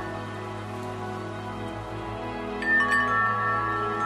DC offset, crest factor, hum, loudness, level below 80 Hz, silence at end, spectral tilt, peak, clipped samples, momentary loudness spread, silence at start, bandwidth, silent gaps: under 0.1%; 16 dB; none; -27 LUFS; -50 dBFS; 0 s; -5.5 dB/octave; -12 dBFS; under 0.1%; 13 LU; 0 s; 14 kHz; none